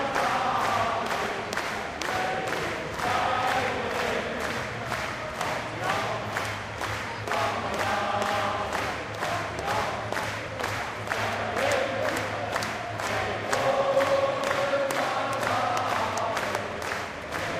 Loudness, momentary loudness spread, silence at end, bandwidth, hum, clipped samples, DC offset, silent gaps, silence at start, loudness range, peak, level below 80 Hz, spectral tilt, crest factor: -28 LUFS; 6 LU; 0 s; 16 kHz; none; under 0.1%; under 0.1%; none; 0 s; 3 LU; -8 dBFS; -52 dBFS; -3.5 dB/octave; 20 dB